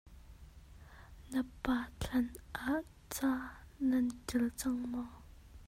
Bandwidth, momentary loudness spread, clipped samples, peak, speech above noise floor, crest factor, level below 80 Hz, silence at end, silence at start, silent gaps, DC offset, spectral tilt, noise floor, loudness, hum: 16 kHz; 23 LU; under 0.1%; -20 dBFS; 20 dB; 18 dB; -54 dBFS; 0 s; 0.05 s; none; under 0.1%; -4.5 dB/octave; -56 dBFS; -37 LUFS; none